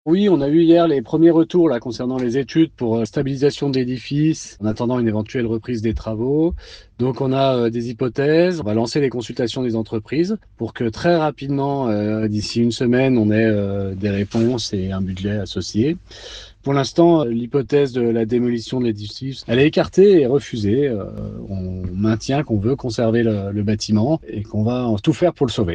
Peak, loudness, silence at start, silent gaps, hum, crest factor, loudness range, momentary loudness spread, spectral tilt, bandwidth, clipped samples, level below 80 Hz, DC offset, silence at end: 0 dBFS; -19 LUFS; 0.05 s; none; none; 18 dB; 4 LU; 9 LU; -7 dB/octave; 9 kHz; under 0.1%; -44 dBFS; under 0.1%; 0 s